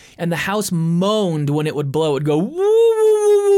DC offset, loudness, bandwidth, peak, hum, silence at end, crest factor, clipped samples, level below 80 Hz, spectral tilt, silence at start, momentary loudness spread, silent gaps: under 0.1%; -17 LUFS; 17 kHz; -6 dBFS; none; 0 s; 10 dB; under 0.1%; -56 dBFS; -6 dB/octave; 0.2 s; 7 LU; none